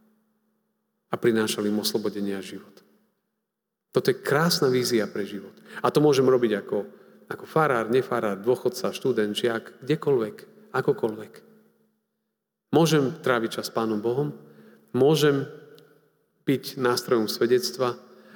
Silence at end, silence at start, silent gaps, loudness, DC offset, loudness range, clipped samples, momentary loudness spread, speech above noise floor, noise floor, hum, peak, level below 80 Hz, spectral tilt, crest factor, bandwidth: 0.35 s; 1.1 s; none; -25 LUFS; under 0.1%; 5 LU; under 0.1%; 13 LU; 59 dB; -83 dBFS; none; -6 dBFS; -78 dBFS; -5 dB/octave; 20 dB; over 20 kHz